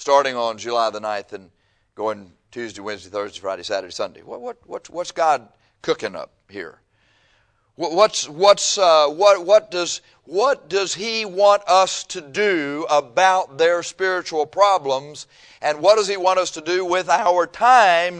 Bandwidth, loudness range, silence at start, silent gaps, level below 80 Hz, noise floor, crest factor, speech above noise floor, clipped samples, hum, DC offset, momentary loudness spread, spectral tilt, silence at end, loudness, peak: 10 kHz; 10 LU; 0 s; none; -66 dBFS; -62 dBFS; 20 dB; 43 dB; under 0.1%; none; under 0.1%; 18 LU; -2 dB/octave; 0 s; -19 LUFS; 0 dBFS